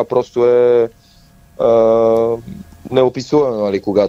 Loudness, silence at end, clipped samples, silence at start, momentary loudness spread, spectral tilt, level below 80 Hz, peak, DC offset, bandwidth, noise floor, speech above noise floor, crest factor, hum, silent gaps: -14 LUFS; 0 s; under 0.1%; 0 s; 10 LU; -7 dB/octave; -48 dBFS; 0 dBFS; under 0.1%; 7.8 kHz; -47 dBFS; 33 dB; 14 dB; none; none